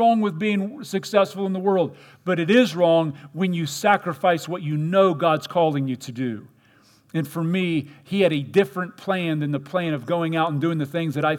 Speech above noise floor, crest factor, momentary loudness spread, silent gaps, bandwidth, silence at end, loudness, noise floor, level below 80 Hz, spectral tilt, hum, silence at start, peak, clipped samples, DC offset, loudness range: 35 dB; 18 dB; 10 LU; none; 17 kHz; 0 s; -22 LUFS; -56 dBFS; -70 dBFS; -6.5 dB/octave; none; 0 s; -4 dBFS; under 0.1%; under 0.1%; 4 LU